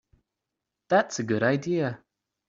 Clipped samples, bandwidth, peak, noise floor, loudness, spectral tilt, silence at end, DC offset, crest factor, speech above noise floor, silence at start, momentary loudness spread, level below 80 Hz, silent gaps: under 0.1%; 7.8 kHz; -8 dBFS; -85 dBFS; -26 LUFS; -5.5 dB/octave; 0.55 s; under 0.1%; 20 dB; 60 dB; 0.9 s; 7 LU; -70 dBFS; none